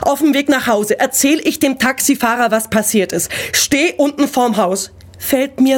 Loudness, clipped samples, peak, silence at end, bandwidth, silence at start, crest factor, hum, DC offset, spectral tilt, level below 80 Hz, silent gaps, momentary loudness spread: -14 LUFS; under 0.1%; -2 dBFS; 0 s; 17.5 kHz; 0 s; 12 dB; none; under 0.1%; -3 dB/octave; -48 dBFS; none; 5 LU